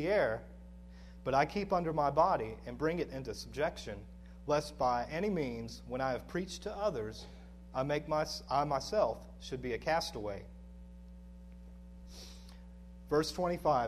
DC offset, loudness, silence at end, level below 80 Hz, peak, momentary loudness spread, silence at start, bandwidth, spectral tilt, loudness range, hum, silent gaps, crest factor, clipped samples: under 0.1%; -35 LUFS; 0 s; -52 dBFS; -16 dBFS; 22 LU; 0 s; 13.5 kHz; -5.5 dB/octave; 7 LU; none; none; 20 dB; under 0.1%